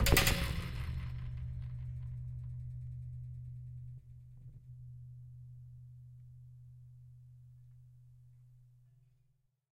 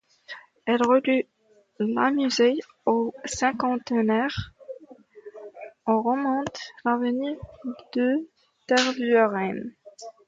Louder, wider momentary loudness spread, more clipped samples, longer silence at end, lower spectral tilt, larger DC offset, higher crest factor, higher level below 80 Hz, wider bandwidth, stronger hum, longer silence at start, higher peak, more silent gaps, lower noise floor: second, -39 LUFS vs -25 LUFS; about the same, 20 LU vs 21 LU; neither; first, 0.95 s vs 0.2 s; about the same, -4 dB/octave vs -4.5 dB/octave; neither; first, 28 dB vs 18 dB; first, -44 dBFS vs -58 dBFS; first, 16 kHz vs 9.2 kHz; neither; second, 0 s vs 0.3 s; second, -12 dBFS vs -8 dBFS; neither; first, -74 dBFS vs -49 dBFS